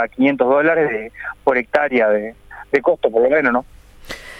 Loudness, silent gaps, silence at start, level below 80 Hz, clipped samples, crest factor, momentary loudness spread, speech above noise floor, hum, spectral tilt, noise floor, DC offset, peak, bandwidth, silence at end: -17 LUFS; none; 0 s; -48 dBFS; under 0.1%; 16 dB; 13 LU; 19 dB; none; -6 dB/octave; -35 dBFS; under 0.1%; -2 dBFS; 13 kHz; 0 s